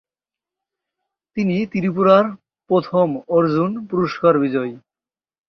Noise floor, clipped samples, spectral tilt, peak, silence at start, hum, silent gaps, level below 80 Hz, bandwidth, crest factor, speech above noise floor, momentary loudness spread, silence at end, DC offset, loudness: under -90 dBFS; under 0.1%; -8.5 dB/octave; -2 dBFS; 1.35 s; none; none; -60 dBFS; 6.2 kHz; 18 dB; over 73 dB; 10 LU; 0.7 s; under 0.1%; -18 LUFS